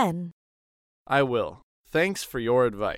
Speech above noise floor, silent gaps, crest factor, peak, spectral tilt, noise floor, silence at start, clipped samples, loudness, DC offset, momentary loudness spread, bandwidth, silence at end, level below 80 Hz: over 65 dB; 0.32-1.06 s, 1.63-1.84 s; 18 dB; -8 dBFS; -5.5 dB/octave; under -90 dBFS; 0 s; under 0.1%; -26 LUFS; under 0.1%; 11 LU; 16.5 kHz; 0 s; -54 dBFS